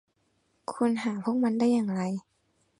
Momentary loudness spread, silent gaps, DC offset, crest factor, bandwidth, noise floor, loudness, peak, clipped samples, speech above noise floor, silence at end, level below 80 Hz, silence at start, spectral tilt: 13 LU; none; under 0.1%; 16 dB; 11 kHz; -72 dBFS; -28 LUFS; -14 dBFS; under 0.1%; 45 dB; 0.6 s; -74 dBFS; 0.7 s; -7 dB/octave